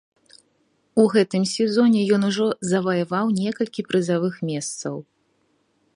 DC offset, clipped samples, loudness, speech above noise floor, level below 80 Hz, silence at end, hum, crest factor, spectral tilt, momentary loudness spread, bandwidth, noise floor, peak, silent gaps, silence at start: under 0.1%; under 0.1%; -21 LUFS; 46 dB; -68 dBFS; 0.95 s; none; 18 dB; -5.5 dB/octave; 10 LU; 11 kHz; -66 dBFS; -4 dBFS; none; 0.95 s